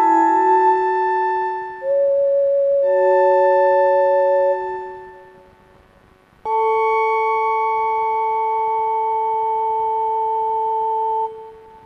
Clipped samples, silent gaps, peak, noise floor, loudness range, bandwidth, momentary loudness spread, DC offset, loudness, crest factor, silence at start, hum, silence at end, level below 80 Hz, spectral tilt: under 0.1%; none; -6 dBFS; -51 dBFS; 5 LU; 7.4 kHz; 9 LU; under 0.1%; -18 LUFS; 12 dB; 0 s; none; 0.25 s; -62 dBFS; -5.5 dB/octave